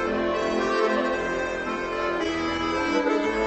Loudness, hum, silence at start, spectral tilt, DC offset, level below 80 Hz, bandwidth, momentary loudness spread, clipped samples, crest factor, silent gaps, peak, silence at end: -25 LUFS; none; 0 s; -4.5 dB/octave; under 0.1%; -46 dBFS; 8.4 kHz; 4 LU; under 0.1%; 14 dB; none; -10 dBFS; 0 s